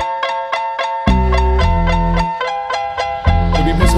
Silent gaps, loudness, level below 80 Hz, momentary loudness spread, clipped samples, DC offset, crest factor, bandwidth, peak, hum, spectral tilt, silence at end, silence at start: none; -16 LUFS; -18 dBFS; 6 LU; under 0.1%; under 0.1%; 14 dB; 13 kHz; 0 dBFS; none; -6 dB/octave; 0 s; 0 s